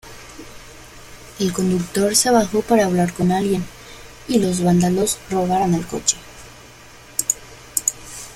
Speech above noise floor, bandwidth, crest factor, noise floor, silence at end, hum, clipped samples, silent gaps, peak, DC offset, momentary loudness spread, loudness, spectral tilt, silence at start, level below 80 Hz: 25 dB; 16 kHz; 20 dB; -43 dBFS; 0 s; none; under 0.1%; none; 0 dBFS; under 0.1%; 23 LU; -19 LUFS; -4.5 dB/octave; 0.05 s; -46 dBFS